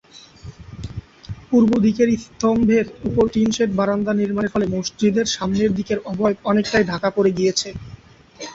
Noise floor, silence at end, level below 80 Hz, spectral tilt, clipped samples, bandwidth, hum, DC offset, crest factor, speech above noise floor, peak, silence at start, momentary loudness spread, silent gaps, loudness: -43 dBFS; 0 s; -46 dBFS; -5.5 dB/octave; under 0.1%; 8 kHz; none; under 0.1%; 18 dB; 24 dB; -2 dBFS; 0.15 s; 19 LU; none; -19 LUFS